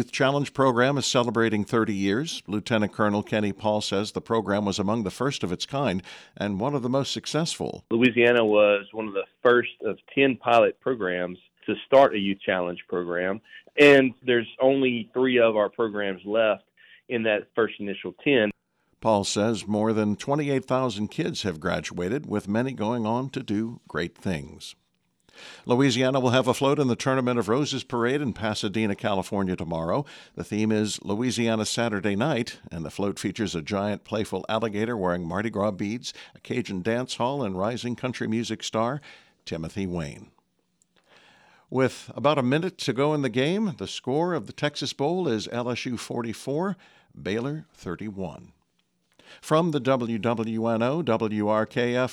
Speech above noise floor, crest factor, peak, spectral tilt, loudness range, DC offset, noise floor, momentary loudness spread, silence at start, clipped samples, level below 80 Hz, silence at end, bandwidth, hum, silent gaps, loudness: 47 dB; 18 dB; -6 dBFS; -5.5 dB/octave; 8 LU; under 0.1%; -72 dBFS; 11 LU; 0 s; under 0.1%; -60 dBFS; 0 s; 13.5 kHz; none; none; -25 LUFS